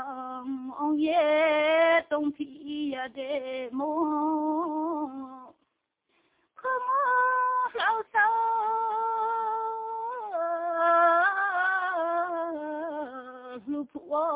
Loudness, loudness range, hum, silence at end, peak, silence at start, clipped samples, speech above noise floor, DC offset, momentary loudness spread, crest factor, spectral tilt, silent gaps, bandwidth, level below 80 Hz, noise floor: -27 LUFS; 5 LU; none; 0 s; -12 dBFS; 0 s; under 0.1%; 49 dB; under 0.1%; 13 LU; 16 dB; -6.5 dB/octave; none; 4 kHz; -76 dBFS; -78 dBFS